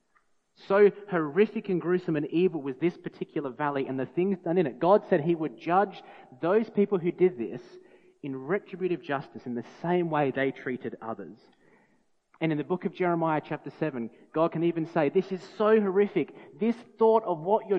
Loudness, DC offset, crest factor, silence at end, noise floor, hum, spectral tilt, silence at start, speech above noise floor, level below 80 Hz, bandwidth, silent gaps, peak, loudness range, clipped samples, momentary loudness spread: -28 LUFS; under 0.1%; 20 dB; 0 s; -68 dBFS; none; -9 dB/octave; 0.65 s; 41 dB; -80 dBFS; 6.2 kHz; none; -8 dBFS; 5 LU; under 0.1%; 14 LU